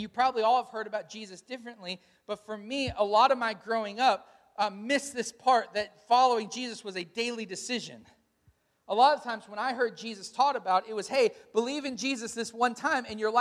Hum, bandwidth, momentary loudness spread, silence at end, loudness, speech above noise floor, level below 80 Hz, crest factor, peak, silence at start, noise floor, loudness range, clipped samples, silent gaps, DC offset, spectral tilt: none; 13.5 kHz; 16 LU; 0 s; -29 LUFS; 39 dB; -66 dBFS; 20 dB; -10 dBFS; 0 s; -68 dBFS; 3 LU; under 0.1%; none; under 0.1%; -3 dB/octave